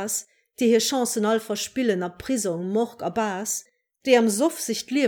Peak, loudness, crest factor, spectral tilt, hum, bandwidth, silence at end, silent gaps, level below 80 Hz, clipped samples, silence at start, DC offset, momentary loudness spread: -6 dBFS; -24 LUFS; 18 dB; -3.5 dB/octave; none; 20 kHz; 0 s; none; -64 dBFS; under 0.1%; 0 s; under 0.1%; 9 LU